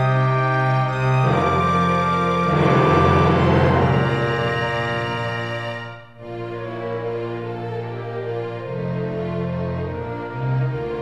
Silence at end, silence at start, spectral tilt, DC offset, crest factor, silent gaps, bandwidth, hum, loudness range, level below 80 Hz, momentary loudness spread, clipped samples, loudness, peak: 0 s; 0 s; -7.5 dB/octave; 0.3%; 16 dB; none; 8.6 kHz; none; 11 LU; -42 dBFS; 12 LU; under 0.1%; -20 LUFS; -4 dBFS